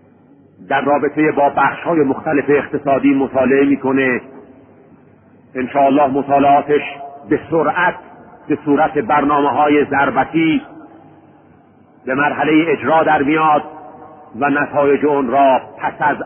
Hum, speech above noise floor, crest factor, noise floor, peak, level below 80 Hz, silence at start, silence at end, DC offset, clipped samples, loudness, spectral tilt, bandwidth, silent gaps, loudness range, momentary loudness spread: none; 33 dB; 14 dB; -47 dBFS; -2 dBFS; -52 dBFS; 0.6 s; 0 s; under 0.1%; under 0.1%; -15 LUFS; -11.5 dB/octave; 3.5 kHz; none; 2 LU; 8 LU